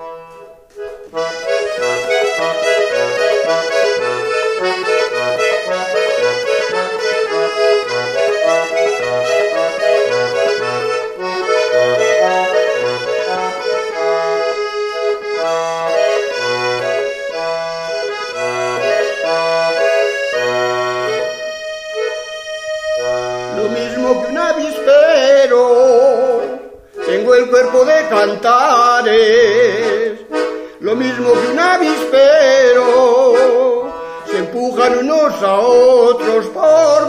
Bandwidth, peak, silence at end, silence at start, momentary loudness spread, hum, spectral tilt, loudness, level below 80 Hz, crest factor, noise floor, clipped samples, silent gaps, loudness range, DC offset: 13.5 kHz; 0 dBFS; 0 s; 0 s; 11 LU; none; -3 dB/octave; -14 LUFS; -56 dBFS; 14 dB; -38 dBFS; under 0.1%; none; 6 LU; under 0.1%